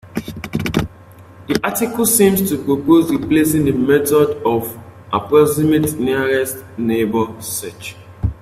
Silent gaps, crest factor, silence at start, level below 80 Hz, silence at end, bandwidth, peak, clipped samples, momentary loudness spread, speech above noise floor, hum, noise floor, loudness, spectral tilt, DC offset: none; 16 dB; 0.05 s; -40 dBFS; 0.1 s; 16 kHz; 0 dBFS; under 0.1%; 13 LU; 25 dB; none; -41 dBFS; -16 LUFS; -5 dB/octave; under 0.1%